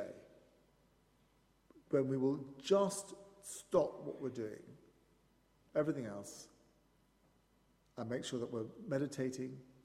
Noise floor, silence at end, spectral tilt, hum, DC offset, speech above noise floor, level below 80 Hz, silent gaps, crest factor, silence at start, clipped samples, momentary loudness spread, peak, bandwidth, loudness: -73 dBFS; 0.2 s; -5.5 dB/octave; none; under 0.1%; 34 dB; -76 dBFS; none; 22 dB; 0 s; under 0.1%; 18 LU; -18 dBFS; 15 kHz; -39 LUFS